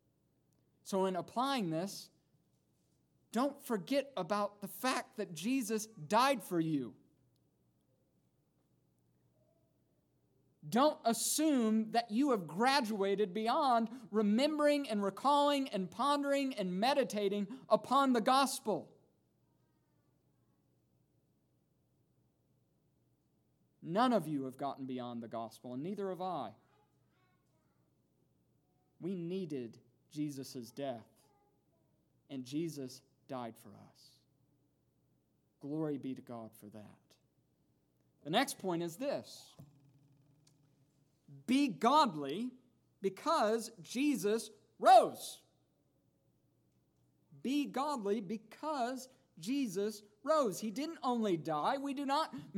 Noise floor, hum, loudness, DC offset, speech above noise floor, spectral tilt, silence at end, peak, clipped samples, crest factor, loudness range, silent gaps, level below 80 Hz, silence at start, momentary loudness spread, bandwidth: -77 dBFS; none; -35 LUFS; under 0.1%; 42 dB; -4.5 dB/octave; 0 s; -14 dBFS; under 0.1%; 24 dB; 14 LU; none; -90 dBFS; 0.85 s; 16 LU; 19 kHz